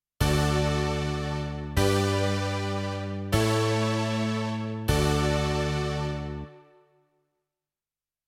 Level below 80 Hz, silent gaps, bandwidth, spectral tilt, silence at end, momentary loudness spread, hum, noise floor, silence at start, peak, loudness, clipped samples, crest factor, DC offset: -38 dBFS; none; 16.5 kHz; -5.5 dB/octave; 1.65 s; 8 LU; 50 Hz at -55 dBFS; under -90 dBFS; 0.2 s; -8 dBFS; -27 LUFS; under 0.1%; 18 dB; under 0.1%